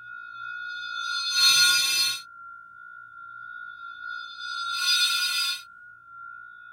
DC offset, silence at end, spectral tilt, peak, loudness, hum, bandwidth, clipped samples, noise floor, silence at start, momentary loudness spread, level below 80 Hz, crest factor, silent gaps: under 0.1%; 0 s; 3.5 dB/octave; -8 dBFS; -22 LUFS; none; 16.5 kHz; under 0.1%; -48 dBFS; 0 s; 26 LU; -78 dBFS; 20 dB; none